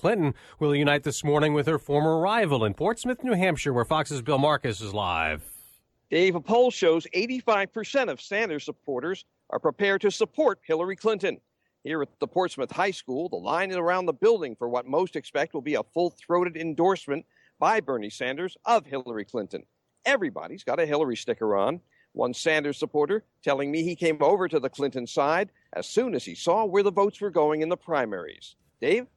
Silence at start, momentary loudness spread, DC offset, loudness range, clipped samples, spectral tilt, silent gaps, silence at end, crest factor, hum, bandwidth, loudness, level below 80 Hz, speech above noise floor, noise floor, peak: 0.05 s; 10 LU; under 0.1%; 3 LU; under 0.1%; -5.5 dB/octave; none; 0.1 s; 18 dB; none; 14 kHz; -26 LUFS; -60 dBFS; 32 dB; -58 dBFS; -8 dBFS